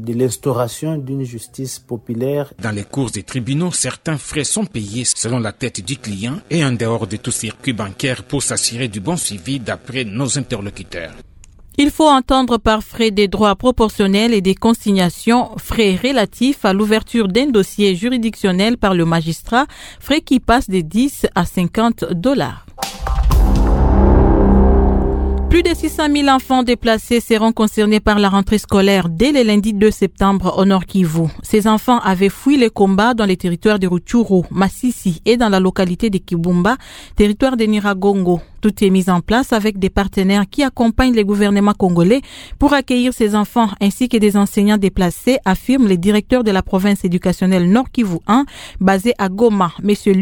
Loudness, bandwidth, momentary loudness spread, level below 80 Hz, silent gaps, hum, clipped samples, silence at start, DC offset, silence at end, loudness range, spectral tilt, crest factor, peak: -15 LUFS; 18.5 kHz; 9 LU; -26 dBFS; none; none; under 0.1%; 0 s; under 0.1%; 0 s; 6 LU; -5.5 dB/octave; 14 dB; 0 dBFS